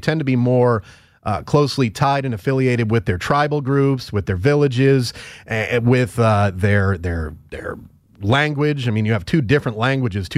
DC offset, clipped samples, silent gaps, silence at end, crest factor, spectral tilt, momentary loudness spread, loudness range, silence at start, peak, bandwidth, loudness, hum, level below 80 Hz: under 0.1%; under 0.1%; none; 0 s; 14 dB; -7 dB/octave; 10 LU; 2 LU; 0 s; -4 dBFS; 14 kHz; -18 LUFS; none; -42 dBFS